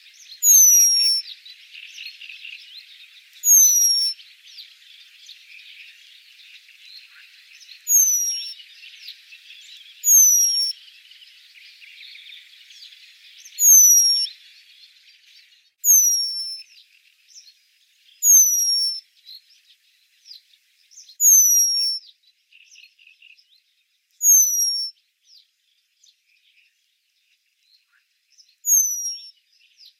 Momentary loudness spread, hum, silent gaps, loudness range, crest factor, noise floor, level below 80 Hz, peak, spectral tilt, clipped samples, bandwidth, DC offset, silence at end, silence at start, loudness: 25 LU; none; none; 8 LU; 18 dB; -68 dBFS; under -90 dBFS; -4 dBFS; 14.5 dB/octave; under 0.1%; 17 kHz; under 0.1%; 0.8 s; 0.3 s; -14 LUFS